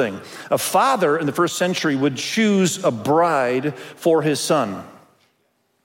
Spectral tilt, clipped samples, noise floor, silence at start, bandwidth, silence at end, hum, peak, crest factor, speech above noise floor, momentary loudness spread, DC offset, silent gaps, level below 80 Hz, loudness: -4.5 dB/octave; under 0.1%; -66 dBFS; 0 s; 16.5 kHz; 0.95 s; none; -4 dBFS; 16 dB; 47 dB; 7 LU; under 0.1%; none; -68 dBFS; -19 LUFS